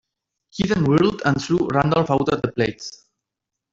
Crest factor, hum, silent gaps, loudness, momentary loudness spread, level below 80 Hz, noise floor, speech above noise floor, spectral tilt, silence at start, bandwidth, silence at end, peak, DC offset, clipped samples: 18 dB; none; none; -20 LUFS; 12 LU; -48 dBFS; -84 dBFS; 64 dB; -6.5 dB/octave; 0.55 s; 8 kHz; 0.8 s; -4 dBFS; under 0.1%; under 0.1%